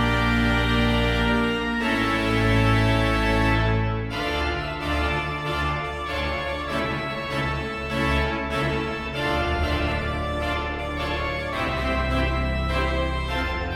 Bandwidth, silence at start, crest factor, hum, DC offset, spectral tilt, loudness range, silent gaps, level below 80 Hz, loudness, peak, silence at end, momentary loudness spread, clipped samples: 16 kHz; 0 s; 16 dB; none; under 0.1%; -6 dB/octave; 5 LU; none; -30 dBFS; -24 LUFS; -8 dBFS; 0 s; 6 LU; under 0.1%